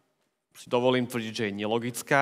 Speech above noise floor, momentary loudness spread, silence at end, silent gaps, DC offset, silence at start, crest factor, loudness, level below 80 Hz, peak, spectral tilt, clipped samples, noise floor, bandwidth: 48 dB; 6 LU; 0 s; none; under 0.1%; 0.55 s; 22 dB; -28 LUFS; -80 dBFS; -8 dBFS; -4.5 dB/octave; under 0.1%; -75 dBFS; 16 kHz